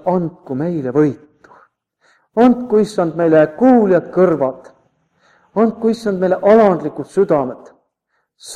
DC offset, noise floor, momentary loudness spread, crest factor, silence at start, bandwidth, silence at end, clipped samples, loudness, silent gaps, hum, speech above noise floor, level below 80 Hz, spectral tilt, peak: under 0.1%; -69 dBFS; 11 LU; 16 dB; 0.05 s; 11 kHz; 0 s; under 0.1%; -15 LUFS; none; none; 55 dB; -56 dBFS; -7.5 dB/octave; 0 dBFS